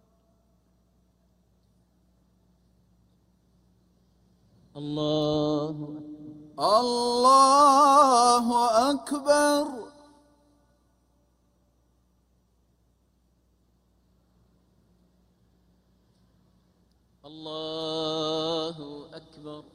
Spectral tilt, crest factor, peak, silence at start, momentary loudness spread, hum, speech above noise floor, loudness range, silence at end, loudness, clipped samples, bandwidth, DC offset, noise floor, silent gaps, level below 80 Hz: -3.5 dB/octave; 20 dB; -6 dBFS; 4.75 s; 26 LU; none; 45 dB; 16 LU; 0.15 s; -23 LUFS; under 0.1%; 16 kHz; under 0.1%; -67 dBFS; none; -66 dBFS